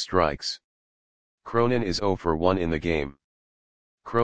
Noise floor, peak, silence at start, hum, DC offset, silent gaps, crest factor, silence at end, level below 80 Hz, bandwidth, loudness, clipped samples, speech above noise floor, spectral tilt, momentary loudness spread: under -90 dBFS; -4 dBFS; 0 s; none; 0.9%; 0.64-1.38 s, 3.24-3.98 s; 22 dB; 0 s; -46 dBFS; 9.6 kHz; -26 LUFS; under 0.1%; over 65 dB; -5.5 dB/octave; 8 LU